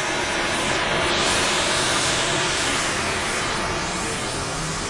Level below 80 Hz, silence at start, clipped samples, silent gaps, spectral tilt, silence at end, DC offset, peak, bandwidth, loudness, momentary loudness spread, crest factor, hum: -42 dBFS; 0 s; under 0.1%; none; -2 dB/octave; 0 s; under 0.1%; -8 dBFS; 11.5 kHz; -21 LUFS; 6 LU; 14 dB; none